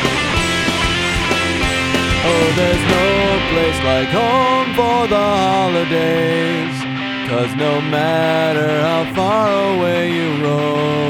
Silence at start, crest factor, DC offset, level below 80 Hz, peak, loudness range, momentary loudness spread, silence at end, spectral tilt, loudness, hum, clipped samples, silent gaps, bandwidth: 0 s; 14 dB; under 0.1%; -34 dBFS; 0 dBFS; 2 LU; 4 LU; 0 s; -5 dB/octave; -15 LUFS; none; under 0.1%; none; 16.5 kHz